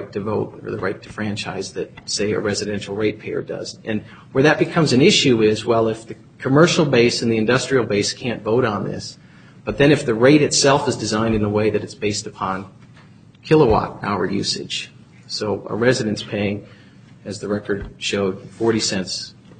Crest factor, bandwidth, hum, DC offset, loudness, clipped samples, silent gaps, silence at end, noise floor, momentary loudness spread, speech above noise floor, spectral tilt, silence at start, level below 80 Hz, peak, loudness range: 20 dB; 9.4 kHz; none; under 0.1%; -19 LUFS; under 0.1%; none; 0.3 s; -46 dBFS; 14 LU; 27 dB; -4.5 dB/octave; 0 s; -46 dBFS; 0 dBFS; 8 LU